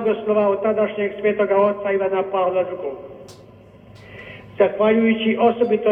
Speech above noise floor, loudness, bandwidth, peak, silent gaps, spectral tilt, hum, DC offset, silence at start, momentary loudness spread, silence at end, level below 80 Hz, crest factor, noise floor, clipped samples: 26 dB; -19 LUFS; 6.4 kHz; -2 dBFS; none; -7.5 dB/octave; none; under 0.1%; 0 s; 20 LU; 0 s; -58 dBFS; 18 dB; -45 dBFS; under 0.1%